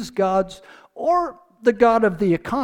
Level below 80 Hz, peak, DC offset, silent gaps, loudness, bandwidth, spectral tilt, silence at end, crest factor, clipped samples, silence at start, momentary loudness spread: -50 dBFS; -2 dBFS; under 0.1%; none; -20 LUFS; 13.5 kHz; -6.5 dB/octave; 0 s; 18 dB; under 0.1%; 0 s; 10 LU